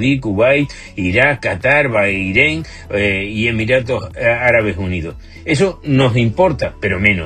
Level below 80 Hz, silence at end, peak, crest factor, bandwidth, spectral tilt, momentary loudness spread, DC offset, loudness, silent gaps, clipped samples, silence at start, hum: -36 dBFS; 0 s; 0 dBFS; 16 dB; 9.6 kHz; -6.5 dB/octave; 9 LU; under 0.1%; -15 LUFS; none; under 0.1%; 0 s; none